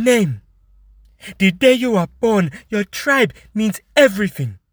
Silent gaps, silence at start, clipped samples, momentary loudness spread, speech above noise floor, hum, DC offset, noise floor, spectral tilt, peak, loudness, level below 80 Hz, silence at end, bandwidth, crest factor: none; 0 s; under 0.1%; 9 LU; 34 dB; none; under 0.1%; -50 dBFS; -5 dB/octave; 0 dBFS; -17 LUFS; -50 dBFS; 0.15 s; over 20 kHz; 18 dB